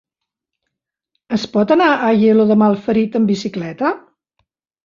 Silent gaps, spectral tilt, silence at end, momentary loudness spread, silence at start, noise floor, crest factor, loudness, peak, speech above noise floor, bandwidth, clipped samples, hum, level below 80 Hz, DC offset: none; -7 dB/octave; 0.9 s; 10 LU; 1.3 s; -81 dBFS; 14 dB; -15 LUFS; -2 dBFS; 67 dB; 7.2 kHz; under 0.1%; none; -58 dBFS; under 0.1%